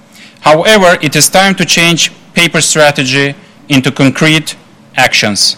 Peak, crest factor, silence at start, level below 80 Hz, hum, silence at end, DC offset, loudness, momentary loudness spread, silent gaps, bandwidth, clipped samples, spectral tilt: 0 dBFS; 10 dB; 0.4 s; -42 dBFS; none; 0 s; under 0.1%; -8 LUFS; 6 LU; none; over 20 kHz; 1%; -3 dB/octave